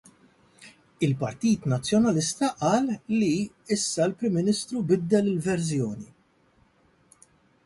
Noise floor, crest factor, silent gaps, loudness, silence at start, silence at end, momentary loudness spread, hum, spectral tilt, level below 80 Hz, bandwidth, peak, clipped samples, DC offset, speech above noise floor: -63 dBFS; 16 dB; none; -25 LUFS; 0.6 s; 1.6 s; 6 LU; none; -5.5 dB/octave; -60 dBFS; 11.5 kHz; -10 dBFS; under 0.1%; under 0.1%; 38 dB